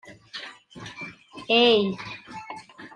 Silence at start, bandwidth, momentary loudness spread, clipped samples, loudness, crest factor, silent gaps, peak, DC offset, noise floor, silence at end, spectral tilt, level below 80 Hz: 0.05 s; 10 kHz; 23 LU; under 0.1%; -20 LUFS; 22 dB; none; -6 dBFS; under 0.1%; -43 dBFS; 0.1 s; -5 dB/octave; -68 dBFS